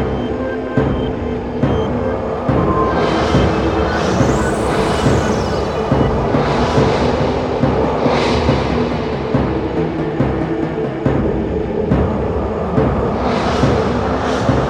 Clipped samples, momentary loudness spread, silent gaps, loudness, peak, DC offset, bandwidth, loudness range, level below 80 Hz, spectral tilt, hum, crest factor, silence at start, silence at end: under 0.1%; 5 LU; none; -16 LUFS; 0 dBFS; under 0.1%; 11.5 kHz; 2 LU; -26 dBFS; -7 dB/octave; none; 16 dB; 0 s; 0 s